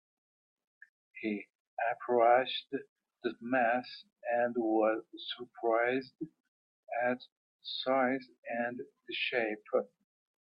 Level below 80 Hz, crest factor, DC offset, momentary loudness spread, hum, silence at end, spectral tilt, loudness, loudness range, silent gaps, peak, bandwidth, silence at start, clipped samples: -86 dBFS; 20 dB; under 0.1%; 15 LU; none; 0.55 s; -7 dB/octave; -33 LUFS; 4 LU; 1.55-1.77 s, 2.89-2.96 s, 6.40-6.83 s, 7.32-7.59 s, 8.38-8.43 s; -14 dBFS; 5.6 kHz; 1.15 s; under 0.1%